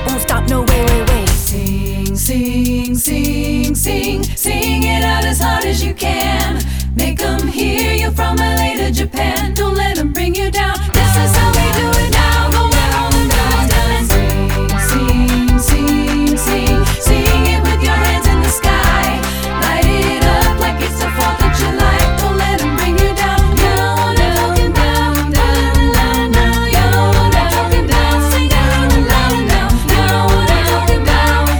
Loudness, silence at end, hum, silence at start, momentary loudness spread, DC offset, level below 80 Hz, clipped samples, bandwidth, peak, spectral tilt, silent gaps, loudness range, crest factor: -13 LUFS; 0 s; none; 0 s; 4 LU; under 0.1%; -16 dBFS; under 0.1%; over 20 kHz; 0 dBFS; -4.5 dB/octave; none; 3 LU; 12 dB